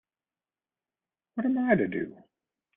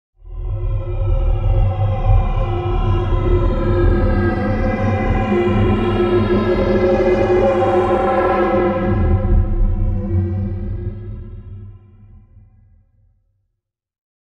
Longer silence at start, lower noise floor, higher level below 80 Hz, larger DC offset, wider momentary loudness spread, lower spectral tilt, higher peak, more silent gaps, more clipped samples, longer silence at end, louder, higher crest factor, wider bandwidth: first, 1.35 s vs 0.25 s; first, under -90 dBFS vs -75 dBFS; second, -68 dBFS vs -22 dBFS; neither; first, 15 LU vs 12 LU; first, -11 dB/octave vs -9.5 dB/octave; second, -8 dBFS vs -2 dBFS; neither; neither; second, 0.65 s vs 2.45 s; second, -28 LUFS vs -17 LUFS; first, 24 dB vs 14 dB; second, 3.8 kHz vs 6 kHz